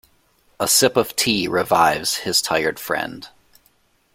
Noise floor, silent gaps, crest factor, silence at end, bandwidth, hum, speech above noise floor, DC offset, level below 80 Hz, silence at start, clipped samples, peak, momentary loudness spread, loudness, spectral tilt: -61 dBFS; none; 20 dB; 0.85 s; 16.5 kHz; none; 41 dB; under 0.1%; -56 dBFS; 0.6 s; under 0.1%; -2 dBFS; 10 LU; -18 LUFS; -2 dB/octave